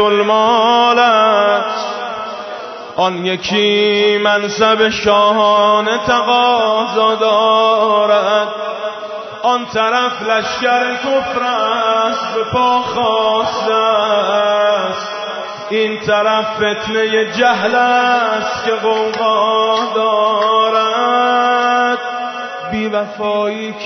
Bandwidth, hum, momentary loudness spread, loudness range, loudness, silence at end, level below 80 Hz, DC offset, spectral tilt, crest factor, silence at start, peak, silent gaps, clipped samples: 6.4 kHz; none; 10 LU; 3 LU; -14 LUFS; 0 s; -52 dBFS; under 0.1%; -3.5 dB/octave; 12 dB; 0 s; -2 dBFS; none; under 0.1%